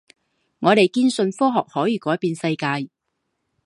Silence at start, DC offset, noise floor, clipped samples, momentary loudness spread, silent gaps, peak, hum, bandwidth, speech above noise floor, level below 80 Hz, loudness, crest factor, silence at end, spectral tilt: 0.6 s; under 0.1%; -76 dBFS; under 0.1%; 8 LU; none; -2 dBFS; none; 11.5 kHz; 56 dB; -70 dBFS; -20 LUFS; 20 dB; 0.8 s; -5.5 dB/octave